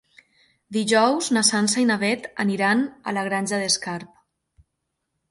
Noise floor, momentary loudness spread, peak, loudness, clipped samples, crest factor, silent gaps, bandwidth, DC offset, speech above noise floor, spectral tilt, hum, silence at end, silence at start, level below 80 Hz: -78 dBFS; 8 LU; -2 dBFS; -21 LUFS; under 0.1%; 22 dB; none; 11.5 kHz; under 0.1%; 57 dB; -3 dB/octave; none; 1.25 s; 0.7 s; -66 dBFS